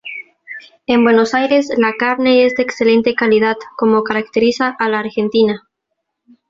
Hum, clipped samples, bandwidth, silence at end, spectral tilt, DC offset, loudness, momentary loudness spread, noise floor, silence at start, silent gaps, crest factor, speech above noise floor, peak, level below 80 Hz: none; under 0.1%; 7.6 kHz; 0.9 s; -5 dB/octave; under 0.1%; -14 LUFS; 16 LU; -74 dBFS; 0.05 s; none; 14 dB; 61 dB; 0 dBFS; -56 dBFS